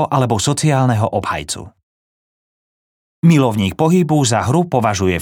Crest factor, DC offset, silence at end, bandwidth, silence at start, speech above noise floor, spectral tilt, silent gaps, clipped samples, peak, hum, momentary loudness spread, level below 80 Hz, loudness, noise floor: 14 dB; under 0.1%; 0 s; 17 kHz; 0 s; over 75 dB; -5.5 dB/octave; 1.83-3.22 s; under 0.1%; -2 dBFS; none; 8 LU; -50 dBFS; -15 LUFS; under -90 dBFS